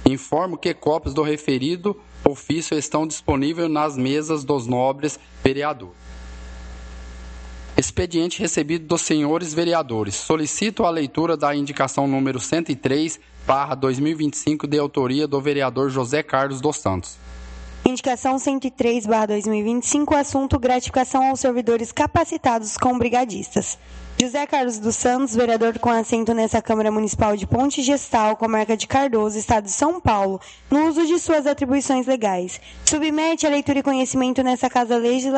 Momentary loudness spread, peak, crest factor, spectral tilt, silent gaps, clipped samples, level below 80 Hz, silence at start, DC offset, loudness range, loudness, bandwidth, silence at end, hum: 7 LU; 0 dBFS; 20 dB; -4.5 dB/octave; none; under 0.1%; -42 dBFS; 0 s; under 0.1%; 3 LU; -21 LUFS; 9 kHz; 0 s; none